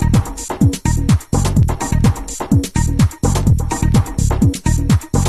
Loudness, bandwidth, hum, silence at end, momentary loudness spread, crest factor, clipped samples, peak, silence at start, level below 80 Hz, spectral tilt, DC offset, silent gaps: -16 LUFS; 14 kHz; none; 0 s; 3 LU; 14 dB; under 0.1%; 0 dBFS; 0 s; -20 dBFS; -6 dB/octave; under 0.1%; none